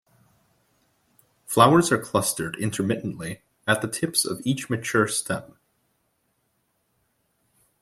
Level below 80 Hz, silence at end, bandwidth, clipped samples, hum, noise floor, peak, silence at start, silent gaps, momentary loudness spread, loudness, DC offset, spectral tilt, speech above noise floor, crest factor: -62 dBFS; 2.35 s; 16.5 kHz; under 0.1%; none; -72 dBFS; -2 dBFS; 1.5 s; none; 15 LU; -23 LUFS; under 0.1%; -4 dB/octave; 49 dB; 26 dB